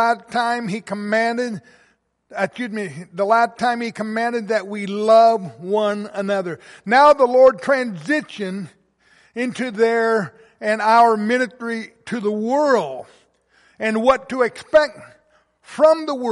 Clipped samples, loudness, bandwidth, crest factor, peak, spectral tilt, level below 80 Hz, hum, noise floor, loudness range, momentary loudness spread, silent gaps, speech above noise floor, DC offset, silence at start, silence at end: under 0.1%; -19 LUFS; 11.5 kHz; 16 dB; -2 dBFS; -5 dB/octave; -60 dBFS; none; -61 dBFS; 6 LU; 15 LU; none; 42 dB; under 0.1%; 0 s; 0 s